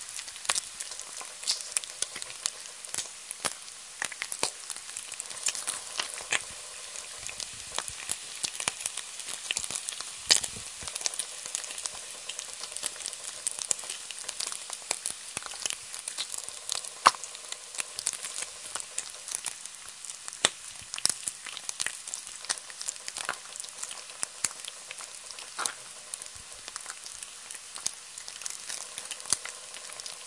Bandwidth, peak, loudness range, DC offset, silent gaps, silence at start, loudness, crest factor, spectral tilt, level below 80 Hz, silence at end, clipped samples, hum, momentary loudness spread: 11.5 kHz; 0 dBFS; 6 LU; under 0.1%; none; 0 s; -33 LUFS; 36 dB; 1.5 dB/octave; -70 dBFS; 0 s; under 0.1%; none; 11 LU